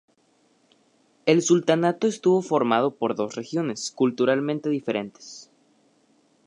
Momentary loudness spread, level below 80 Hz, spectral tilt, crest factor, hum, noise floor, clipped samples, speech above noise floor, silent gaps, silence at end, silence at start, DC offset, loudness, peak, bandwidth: 10 LU; -74 dBFS; -5 dB/octave; 20 dB; none; -64 dBFS; under 0.1%; 41 dB; none; 1.05 s; 1.25 s; under 0.1%; -23 LUFS; -6 dBFS; 10.5 kHz